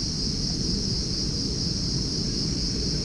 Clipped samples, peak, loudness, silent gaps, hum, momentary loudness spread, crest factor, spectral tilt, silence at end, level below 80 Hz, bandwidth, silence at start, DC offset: under 0.1%; -14 dBFS; -26 LUFS; none; none; 1 LU; 12 dB; -4 dB/octave; 0 s; -34 dBFS; 10.5 kHz; 0 s; under 0.1%